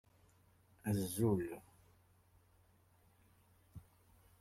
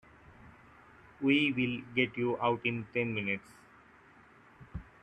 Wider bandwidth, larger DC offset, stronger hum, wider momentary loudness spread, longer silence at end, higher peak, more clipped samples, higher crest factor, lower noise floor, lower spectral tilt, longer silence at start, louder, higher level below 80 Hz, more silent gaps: first, 16 kHz vs 9.8 kHz; neither; neither; first, 24 LU vs 14 LU; first, 0.6 s vs 0.2 s; second, -22 dBFS vs -14 dBFS; neither; about the same, 22 dB vs 20 dB; first, -71 dBFS vs -59 dBFS; about the same, -6.5 dB/octave vs -7 dB/octave; first, 0.85 s vs 0.4 s; second, -39 LUFS vs -31 LUFS; second, -70 dBFS vs -62 dBFS; neither